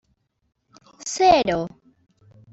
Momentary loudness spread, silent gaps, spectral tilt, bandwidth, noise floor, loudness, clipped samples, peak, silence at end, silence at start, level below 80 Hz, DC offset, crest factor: 18 LU; none; -3.5 dB/octave; 8.2 kHz; -50 dBFS; -19 LUFS; under 0.1%; -4 dBFS; 0.85 s; 1 s; -52 dBFS; under 0.1%; 20 dB